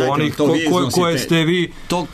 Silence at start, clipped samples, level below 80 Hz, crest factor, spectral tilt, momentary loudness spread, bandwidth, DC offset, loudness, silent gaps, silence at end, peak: 0 s; under 0.1%; -44 dBFS; 10 dB; -5 dB/octave; 5 LU; 13.5 kHz; under 0.1%; -17 LUFS; none; 0 s; -6 dBFS